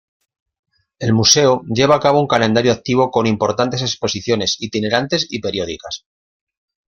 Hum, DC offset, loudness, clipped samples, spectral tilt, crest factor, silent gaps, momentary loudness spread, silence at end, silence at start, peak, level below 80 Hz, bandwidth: none; under 0.1%; -16 LUFS; under 0.1%; -4 dB/octave; 18 dB; none; 11 LU; 0.9 s; 1 s; 0 dBFS; -50 dBFS; 16.5 kHz